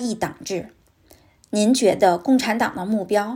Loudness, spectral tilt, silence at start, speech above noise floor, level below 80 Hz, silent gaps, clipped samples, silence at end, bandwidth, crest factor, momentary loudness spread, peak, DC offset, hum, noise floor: -20 LUFS; -4.5 dB/octave; 0 s; 34 dB; -60 dBFS; none; under 0.1%; 0 s; 16.5 kHz; 18 dB; 12 LU; -4 dBFS; under 0.1%; none; -54 dBFS